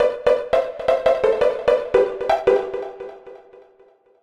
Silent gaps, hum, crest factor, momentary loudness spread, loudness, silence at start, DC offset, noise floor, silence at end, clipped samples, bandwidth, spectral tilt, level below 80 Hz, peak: none; none; 18 dB; 12 LU; -19 LUFS; 0 s; under 0.1%; -54 dBFS; 0.85 s; under 0.1%; 9.8 kHz; -5 dB/octave; -48 dBFS; -4 dBFS